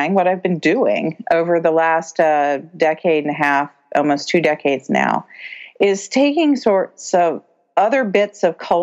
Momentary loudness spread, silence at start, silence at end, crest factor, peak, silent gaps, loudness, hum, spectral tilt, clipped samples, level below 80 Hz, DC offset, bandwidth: 6 LU; 0 s; 0 s; 14 dB; -2 dBFS; none; -17 LUFS; none; -5 dB/octave; under 0.1%; -68 dBFS; under 0.1%; 8.4 kHz